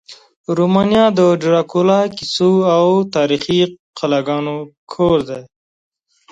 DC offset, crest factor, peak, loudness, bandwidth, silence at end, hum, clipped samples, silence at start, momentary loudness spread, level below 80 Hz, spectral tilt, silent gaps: under 0.1%; 16 dB; 0 dBFS; -15 LUFS; 9.2 kHz; 0.85 s; none; under 0.1%; 0.1 s; 12 LU; -50 dBFS; -6.5 dB/octave; 0.36-0.44 s, 3.79-3.93 s, 4.78-4.87 s